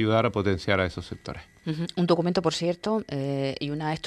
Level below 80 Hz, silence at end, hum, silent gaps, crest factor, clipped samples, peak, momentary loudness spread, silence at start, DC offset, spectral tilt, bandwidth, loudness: -54 dBFS; 0 s; none; none; 20 dB; under 0.1%; -6 dBFS; 14 LU; 0 s; under 0.1%; -6 dB/octave; 11 kHz; -27 LUFS